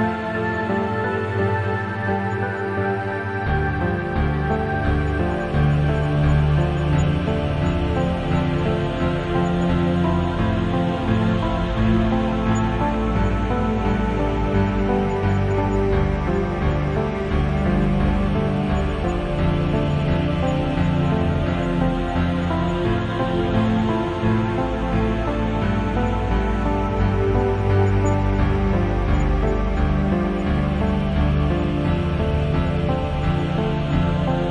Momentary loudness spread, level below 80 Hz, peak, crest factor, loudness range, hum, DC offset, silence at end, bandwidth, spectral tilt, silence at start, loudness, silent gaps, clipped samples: 3 LU; -28 dBFS; -6 dBFS; 14 dB; 1 LU; none; under 0.1%; 0 s; 9.8 kHz; -8 dB/octave; 0 s; -21 LUFS; none; under 0.1%